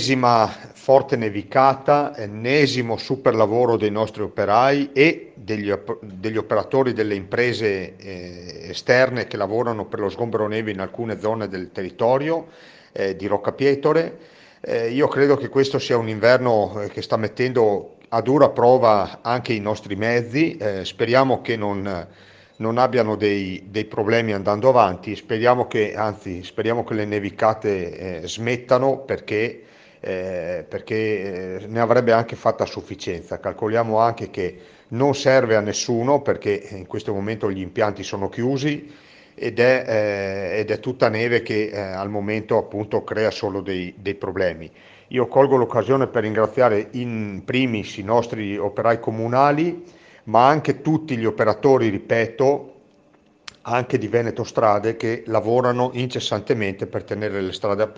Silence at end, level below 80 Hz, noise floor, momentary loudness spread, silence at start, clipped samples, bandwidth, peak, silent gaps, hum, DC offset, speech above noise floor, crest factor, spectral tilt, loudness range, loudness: 0.05 s; -58 dBFS; -56 dBFS; 11 LU; 0 s; under 0.1%; 9 kHz; 0 dBFS; none; none; under 0.1%; 35 dB; 20 dB; -6 dB/octave; 5 LU; -21 LUFS